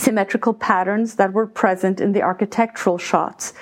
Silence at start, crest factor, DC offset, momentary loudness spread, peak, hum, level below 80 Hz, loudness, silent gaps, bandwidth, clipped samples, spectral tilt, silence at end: 0 s; 18 dB; under 0.1%; 2 LU; 0 dBFS; none; -64 dBFS; -19 LUFS; none; 16.5 kHz; under 0.1%; -5 dB/octave; 0 s